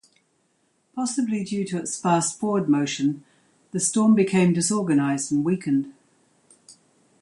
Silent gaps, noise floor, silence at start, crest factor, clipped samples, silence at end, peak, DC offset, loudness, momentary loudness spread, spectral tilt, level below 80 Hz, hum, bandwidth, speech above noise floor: none; -68 dBFS; 0.95 s; 16 dB; under 0.1%; 0.5 s; -8 dBFS; under 0.1%; -23 LUFS; 9 LU; -5 dB/octave; -68 dBFS; none; 11.5 kHz; 46 dB